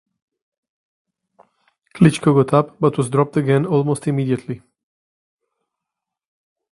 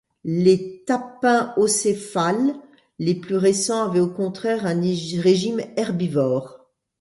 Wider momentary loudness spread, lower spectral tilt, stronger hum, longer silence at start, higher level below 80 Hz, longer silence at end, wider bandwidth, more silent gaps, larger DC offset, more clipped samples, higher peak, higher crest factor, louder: about the same, 8 LU vs 6 LU; first, -7.5 dB/octave vs -5 dB/octave; neither; first, 1.95 s vs 0.25 s; first, -56 dBFS vs -62 dBFS; first, 2.15 s vs 0.45 s; about the same, 11.5 kHz vs 11.5 kHz; neither; neither; neither; first, 0 dBFS vs -4 dBFS; about the same, 20 dB vs 16 dB; first, -17 LUFS vs -21 LUFS